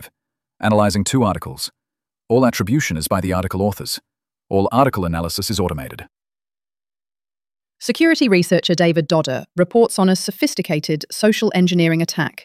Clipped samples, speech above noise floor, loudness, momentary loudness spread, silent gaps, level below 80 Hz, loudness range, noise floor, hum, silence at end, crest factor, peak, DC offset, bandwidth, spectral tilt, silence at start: under 0.1%; over 73 dB; -18 LUFS; 10 LU; none; -46 dBFS; 5 LU; under -90 dBFS; none; 0.15 s; 16 dB; -2 dBFS; under 0.1%; 15.5 kHz; -5 dB/octave; 0 s